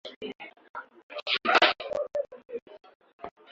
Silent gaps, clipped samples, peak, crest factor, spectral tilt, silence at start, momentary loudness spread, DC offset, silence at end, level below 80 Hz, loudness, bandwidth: 0.16-0.21 s, 0.35-0.39 s, 0.70-0.74 s, 1.03-1.09 s, 2.45-2.49 s, 2.62-2.66 s, 2.95-3.00 s, 3.13-3.19 s; under 0.1%; -6 dBFS; 24 dB; -2.5 dB/octave; 0.05 s; 24 LU; under 0.1%; 0.25 s; -72 dBFS; -26 LUFS; 7.8 kHz